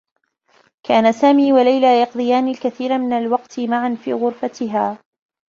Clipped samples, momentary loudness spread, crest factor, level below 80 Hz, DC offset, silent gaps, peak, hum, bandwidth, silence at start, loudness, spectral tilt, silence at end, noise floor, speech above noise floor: under 0.1%; 9 LU; 16 dB; -64 dBFS; under 0.1%; none; -2 dBFS; none; 7.2 kHz; 0.9 s; -17 LUFS; -5.5 dB/octave; 0.55 s; -58 dBFS; 42 dB